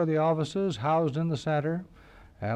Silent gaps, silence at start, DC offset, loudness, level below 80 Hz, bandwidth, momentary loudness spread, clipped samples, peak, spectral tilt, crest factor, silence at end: none; 0 s; under 0.1%; -28 LUFS; -60 dBFS; 9.6 kHz; 8 LU; under 0.1%; -16 dBFS; -7.5 dB/octave; 12 dB; 0 s